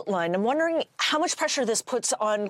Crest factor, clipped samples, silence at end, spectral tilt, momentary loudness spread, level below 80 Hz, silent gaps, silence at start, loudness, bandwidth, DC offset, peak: 16 dB; under 0.1%; 0 s; -2.5 dB/octave; 2 LU; -80 dBFS; none; 0 s; -25 LUFS; 16 kHz; under 0.1%; -10 dBFS